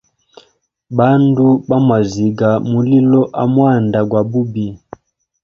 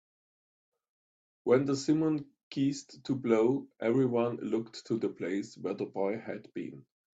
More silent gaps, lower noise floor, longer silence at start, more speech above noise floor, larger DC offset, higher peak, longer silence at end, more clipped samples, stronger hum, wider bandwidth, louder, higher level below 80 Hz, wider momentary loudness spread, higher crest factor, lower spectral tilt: second, none vs 2.43-2.51 s; second, -53 dBFS vs under -90 dBFS; second, 0.9 s vs 1.45 s; second, 41 dB vs over 59 dB; neither; first, 0 dBFS vs -14 dBFS; first, 0.65 s vs 0.35 s; neither; neither; second, 7 kHz vs 8 kHz; first, -13 LUFS vs -32 LUFS; first, -50 dBFS vs -74 dBFS; second, 7 LU vs 13 LU; about the same, 14 dB vs 18 dB; first, -9 dB/octave vs -6.5 dB/octave